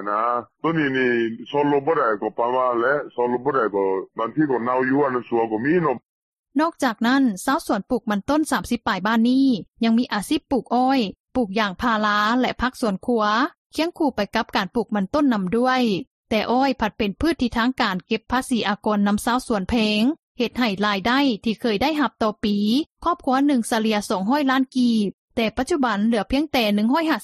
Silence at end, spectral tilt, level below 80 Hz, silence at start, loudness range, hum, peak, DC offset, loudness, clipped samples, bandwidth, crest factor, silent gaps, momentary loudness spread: 0 s; -5 dB/octave; -48 dBFS; 0 s; 1 LU; none; -6 dBFS; under 0.1%; -21 LUFS; under 0.1%; 14 kHz; 16 dB; 6.05-6.43 s, 11.20-11.25 s, 13.58-13.70 s, 16.07-16.25 s, 20.19-20.35 s, 22.86-22.90 s, 25.13-25.28 s; 5 LU